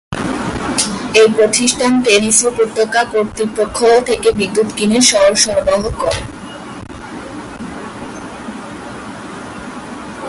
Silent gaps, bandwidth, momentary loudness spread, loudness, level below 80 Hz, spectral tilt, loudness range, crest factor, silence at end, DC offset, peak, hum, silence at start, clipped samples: none; 11.5 kHz; 19 LU; -13 LUFS; -40 dBFS; -2.5 dB/octave; 16 LU; 16 dB; 0 s; under 0.1%; 0 dBFS; none; 0.1 s; under 0.1%